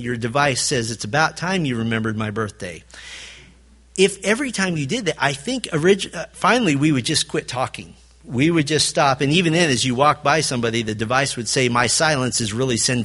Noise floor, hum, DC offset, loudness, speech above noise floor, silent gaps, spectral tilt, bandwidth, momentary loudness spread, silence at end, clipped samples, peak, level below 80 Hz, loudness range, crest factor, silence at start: -49 dBFS; none; under 0.1%; -19 LUFS; 29 dB; none; -4 dB/octave; 11.5 kHz; 11 LU; 0 s; under 0.1%; -2 dBFS; -50 dBFS; 5 LU; 20 dB; 0 s